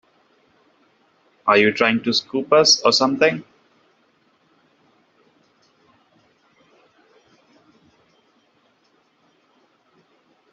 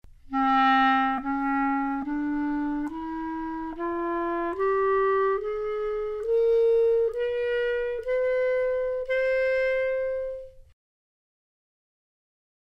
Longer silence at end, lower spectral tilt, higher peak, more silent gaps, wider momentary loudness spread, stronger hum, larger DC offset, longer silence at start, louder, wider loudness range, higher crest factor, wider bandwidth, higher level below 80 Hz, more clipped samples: first, 7.1 s vs 2.1 s; second, -1.5 dB/octave vs -6 dB/octave; first, -2 dBFS vs -12 dBFS; neither; second, 8 LU vs 11 LU; neither; neither; first, 1.45 s vs 0.25 s; first, -17 LUFS vs -26 LUFS; first, 8 LU vs 4 LU; first, 22 dB vs 14 dB; first, 7.8 kHz vs 7 kHz; second, -68 dBFS vs -50 dBFS; neither